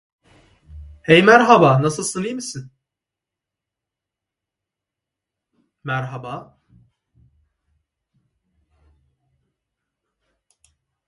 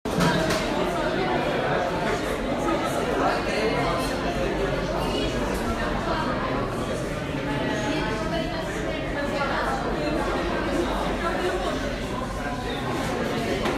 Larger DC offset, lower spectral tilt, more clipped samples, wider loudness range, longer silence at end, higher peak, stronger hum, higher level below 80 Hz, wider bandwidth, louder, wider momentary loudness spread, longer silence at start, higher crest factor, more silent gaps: neither; about the same, -5 dB/octave vs -5 dB/octave; neither; first, 21 LU vs 2 LU; first, 4.65 s vs 0 s; first, 0 dBFS vs -10 dBFS; neither; second, -54 dBFS vs -38 dBFS; second, 11.5 kHz vs 15.5 kHz; first, -15 LUFS vs -26 LUFS; first, 23 LU vs 5 LU; first, 0.75 s vs 0.05 s; first, 22 dB vs 16 dB; neither